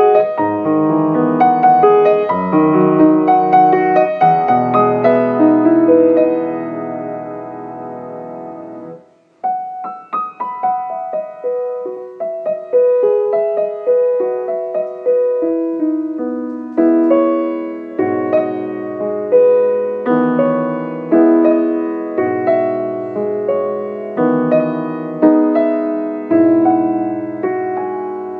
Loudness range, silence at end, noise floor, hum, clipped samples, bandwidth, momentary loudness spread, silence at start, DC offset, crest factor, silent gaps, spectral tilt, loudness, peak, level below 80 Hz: 11 LU; 0 s; -42 dBFS; none; under 0.1%; 4.5 kHz; 13 LU; 0 s; under 0.1%; 14 dB; none; -10.5 dB/octave; -15 LUFS; 0 dBFS; -68 dBFS